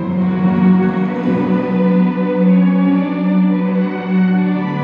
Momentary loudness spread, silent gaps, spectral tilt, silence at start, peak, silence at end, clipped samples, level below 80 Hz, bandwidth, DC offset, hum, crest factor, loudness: 5 LU; none; -10.5 dB/octave; 0 s; -2 dBFS; 0 s; under 0.1%; -54 dBFS; 4.4 kHz; under 0.1%; none; 12 dB; -14 LUFS